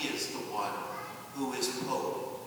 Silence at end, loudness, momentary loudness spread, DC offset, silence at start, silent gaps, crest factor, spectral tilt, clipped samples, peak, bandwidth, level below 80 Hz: 0 s; -35 LUFS; 7 LU; under 0.1%; 0 s; none; 18 dB; -3 dB/octave; under 0.1%; -18 dBFS; over 20 kHz; -76 dBFS